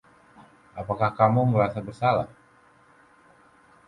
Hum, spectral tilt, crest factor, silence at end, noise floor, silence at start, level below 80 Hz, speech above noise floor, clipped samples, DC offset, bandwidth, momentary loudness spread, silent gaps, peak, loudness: none; -9 dB/octave; 20 dB; 1.6 s; -57 dBFS; 0.75 s; -56 dBFS; 34 dB; under 0.1%; under 0.1%; 10 kHz; 18 LU; none; -6 dBFS; -24 LUFS